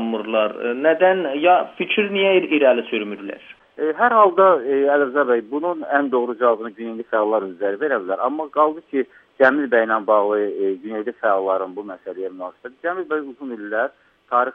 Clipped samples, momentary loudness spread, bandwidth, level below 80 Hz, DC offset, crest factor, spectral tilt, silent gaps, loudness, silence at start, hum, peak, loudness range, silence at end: under 0.1%; 14 LU; 4.1 kHz; -72 dBFS; under 0.1%; 18 dB; -7.5 dB/octave; none; -19 LUFS; 0 s; none; 0 dBFS; 7 LU; 0 s